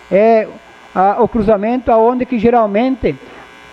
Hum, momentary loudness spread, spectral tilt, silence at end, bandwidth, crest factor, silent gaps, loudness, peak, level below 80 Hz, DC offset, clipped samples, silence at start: none; 9 LU; -8.5 dB/octave; 0.3 s; 7.2 kHz; 12 dB; none; -13 LUFS; -2 dBFS; -38 dBFS; under 0.1%; under 0.1%; 0.1 s